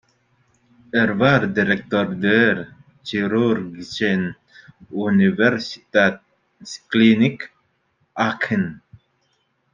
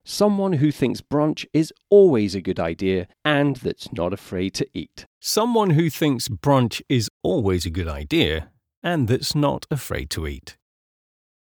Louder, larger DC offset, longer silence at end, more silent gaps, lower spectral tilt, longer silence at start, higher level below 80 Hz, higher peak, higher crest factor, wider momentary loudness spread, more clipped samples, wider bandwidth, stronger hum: first, -19 LUFS vs -22 LUFS; neither; second, 0.95 s vs 1.1 s; second, none vs 5.06-5.21 s, 7.10-7.20 s, 8.77-8.82 s; about the same, -6.5 dB/octave vs -5.5 dB/octave; first, 0.95 s vs 0.05 s; second, -60 dBFS vs -42 dBFS; about the same, -2 dBFS vs -4 dBFS; about the same, 18 dB vs 18 dB; first, 19 LU vs 10 LU; neither; second, 7.4 kHz vs over 20 kHz; neither